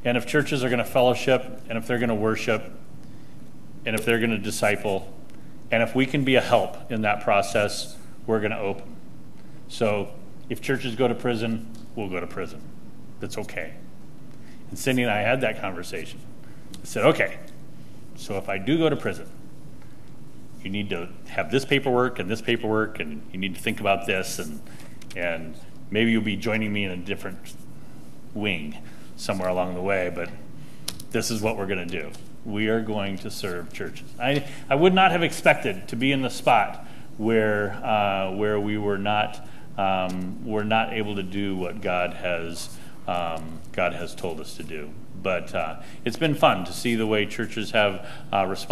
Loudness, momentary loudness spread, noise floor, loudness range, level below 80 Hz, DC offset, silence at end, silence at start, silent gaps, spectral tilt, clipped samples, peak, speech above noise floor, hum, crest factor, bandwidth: -25 LUFS; 20 LU; -46 dBFS; 7 LU; -54 dBFS; 2%; 0 s; 0.05 s; none; -5 dB/octave; under 0.1%; -2 dBFS; 21 dB; none; 22 dB; 15.5 kHz